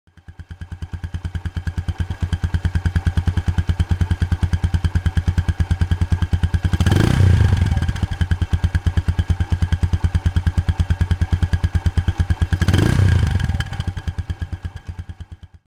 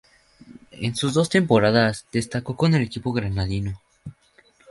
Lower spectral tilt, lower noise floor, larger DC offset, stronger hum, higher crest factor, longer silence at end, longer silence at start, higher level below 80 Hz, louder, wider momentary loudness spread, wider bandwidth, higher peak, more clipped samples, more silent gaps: about the same, -7 dB/octave vs -6 dB/octave; second, -38 dBFS vs -58 dBFS; neither; neither; second, 12 dB vs 20 dB; second, 0.3 s vs 0.6 s; second, 0.3 s vs 0.5 s; first, -26 dBFS vs -46 dBFS; about the same, -20 LUFS vs -22 LUFS; second, 14 LU vs 18 LU; about the same, 10.5 kHz vs 11.5 kHz; about the same, -6 dBFS vs -4 dBFS; neither; neither